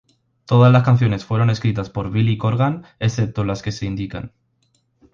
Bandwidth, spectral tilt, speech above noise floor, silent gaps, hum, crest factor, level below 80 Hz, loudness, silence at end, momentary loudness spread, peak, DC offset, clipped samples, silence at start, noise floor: 7.2 kHz; -7.5 dB/octave; 47 dB; none; none; 16 dB; -44 dBFS; -19 LUFS; 0.85 s; 13 LU; -2 dBFS; under 0.1%; under 0.1%; 0.5 s; -64 dBFS